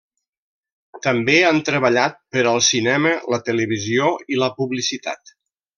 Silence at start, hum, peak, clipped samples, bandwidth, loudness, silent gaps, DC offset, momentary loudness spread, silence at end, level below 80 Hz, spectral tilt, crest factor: 0.95 s; none; -2 dBFS; under 0.1%; 11 kHz; -18 LUFS; none; under 0.1%; 8 LU; 0.65 s; -64 dBFS; -3.5 dB/octave; 18 dB